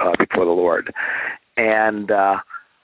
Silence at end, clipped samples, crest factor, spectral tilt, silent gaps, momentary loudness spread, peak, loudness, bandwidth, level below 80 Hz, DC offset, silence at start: 0.25 s; under 0.1%; 18 dB; -8.5 dB/octave; none; 7 LU; -2 dBFS; -19 LUFS; 4 kHz; -58 dBFS; under 0.1%; 0 s